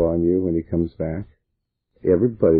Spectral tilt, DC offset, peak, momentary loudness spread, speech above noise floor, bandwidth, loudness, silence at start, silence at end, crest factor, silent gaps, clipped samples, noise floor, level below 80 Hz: -13.5 dB/octave; under 0.1%; -6 dBFS; 11 LU; 57 dB; 4.2 kHz; -22 LUFS; 0 s; 0 s; 16 dB; none; under 0.1%; -77 dBFS; -42 dBFS